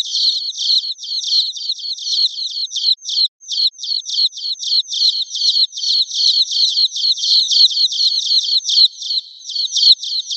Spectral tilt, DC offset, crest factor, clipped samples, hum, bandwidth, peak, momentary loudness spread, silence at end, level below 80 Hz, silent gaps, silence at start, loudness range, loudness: 9.5 dB/octave; under 0.1%; 16 dB; under 0.1%; none; 8.2 kHz; 0 dBFS; 10 LU; 0 s; under -90 dBFS; 3.28-3.39 s; 0 s; 4 LU; -13 LUFS